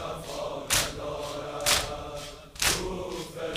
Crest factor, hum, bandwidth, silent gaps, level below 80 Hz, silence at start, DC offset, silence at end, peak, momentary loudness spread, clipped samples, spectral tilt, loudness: 26 dB; none; 16 kHz; none; -46 dBFS; 0 s; under 0.1%; 0 s; -6 dBFS; 12 LU; under 0.1%; -1.5 dB/octave; -29 LUFS